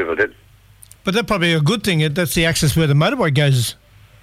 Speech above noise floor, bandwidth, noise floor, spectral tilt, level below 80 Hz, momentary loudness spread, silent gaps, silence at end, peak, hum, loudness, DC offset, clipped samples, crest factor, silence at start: 30 dB; 16 kHz; -46 dBFS; -5 dB/octave; -40 dBFS; 6 LU; none; 0.5 s; -4 dBFS; none; -17 LUFS; under 0.1%; under 0.1%; 14 dB; 0 s